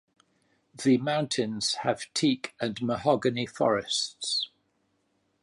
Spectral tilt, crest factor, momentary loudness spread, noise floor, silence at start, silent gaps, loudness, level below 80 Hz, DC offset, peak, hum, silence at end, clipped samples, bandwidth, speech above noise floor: -4 dB/octave; 20 dB; 5 LU; -73 dBFS; 0.8 s; none; -28 LUFS; -66 dBFS; under 0.1%; -10 dBFS; none; 0.95 s; under 0.1%; 11.5 kHz; 45 dB